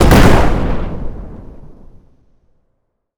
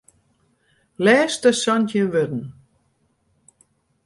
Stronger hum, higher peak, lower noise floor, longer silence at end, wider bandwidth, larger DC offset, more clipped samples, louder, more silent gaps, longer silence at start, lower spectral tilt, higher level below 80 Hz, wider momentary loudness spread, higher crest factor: neither; first, 0 dBFS vs -4 dBFS; about the same, -66 dBFS vs -66 dBFS; about the same, 1.45 s vs 1.55 s; first, over 20 kHz vs 11.5 kHz; neither; neither; first, -13 LUFS vs -19 LUFS; neither; second, 0 s vs 1 s; first, -6 dB/octave vs -4.5 dB/octave; first, -18 dBFS vs -64 dBFS; first, 25 LU vs 12 LU; second, 14 dB vs 20 dB